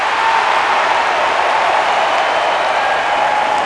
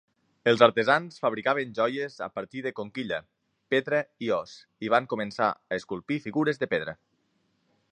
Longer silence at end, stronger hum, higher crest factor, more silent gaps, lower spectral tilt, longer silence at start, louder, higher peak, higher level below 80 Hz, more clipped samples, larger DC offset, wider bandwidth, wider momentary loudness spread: second, 0 s vs 1 s; neither; second, 14 dB vs 26 dB; neither; second, -1.5 dB/octave vs -5.5 dB/octave; second, 0 s vs 0.45 s; first, -14 LUFS vs -27 LUFS; about the same, 0 dBFS vs -2 dBFS; first, -52 dBFS vs -70 dBFS; neither; neither; first, 11 kHz vs 9.8 kHz; second, 1 LU vs 13 LU